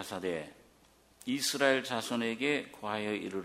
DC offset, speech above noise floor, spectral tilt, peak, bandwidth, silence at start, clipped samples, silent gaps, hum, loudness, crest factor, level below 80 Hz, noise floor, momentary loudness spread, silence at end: under 0.1%; 31 dB; -3 dB/octave; -10 dBFS; 16 kHz; 0 s; under 0.1%; none; none; -33 LUFS; 24 dB; -72 dBFS; -64 dBFS; 11 LU; 0 s